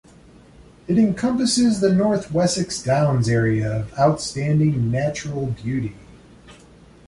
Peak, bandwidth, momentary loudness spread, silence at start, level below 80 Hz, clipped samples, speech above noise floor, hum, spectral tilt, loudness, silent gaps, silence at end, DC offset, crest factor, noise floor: -4 dBFS; 11.5 kHz; 8 LU; 0.9 s; -46 dBFS; under 0.1%; 28 dB; none; -6 dB/octave; -20 LUFS; none; 0.55 s; under 0.1%; 16 dB; -48 dBFS